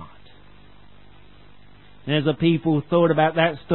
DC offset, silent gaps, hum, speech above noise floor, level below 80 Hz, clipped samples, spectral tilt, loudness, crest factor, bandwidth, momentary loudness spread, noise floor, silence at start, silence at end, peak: 0.5%; none; 50 Hz at -45 dBFS; 31 dB; -54 dBFS; under 0.1%; -11.5 dB/octave; -20 LUFS; 18 dB; 4.2 kHz; 5 LU; -51 dBFS; 0 s; 0 s; -4 dBFS